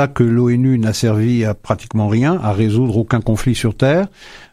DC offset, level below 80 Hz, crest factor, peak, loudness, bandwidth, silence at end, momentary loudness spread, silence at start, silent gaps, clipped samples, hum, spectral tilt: under 0.1%; -38 dBFS; 14 dB; -2 dBFS; -16 LUFS; 14 kHz; 0.1 s; 4 LU; 0 s; none; under 0.1%; none; -7 dB/octave